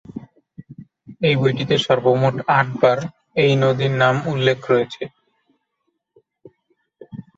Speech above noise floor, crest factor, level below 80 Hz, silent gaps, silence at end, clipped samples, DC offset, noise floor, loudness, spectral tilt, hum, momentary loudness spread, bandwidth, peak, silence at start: 56 dB; 18 dB; -58 dBFS; none; 0.15 s; under 0.1%; under 0.1%; -74 dBFS; -18 LUFS; -6.5 dB/octave; none; 17 LU; 7.8 kHz; -2 dBFS; 0.1 s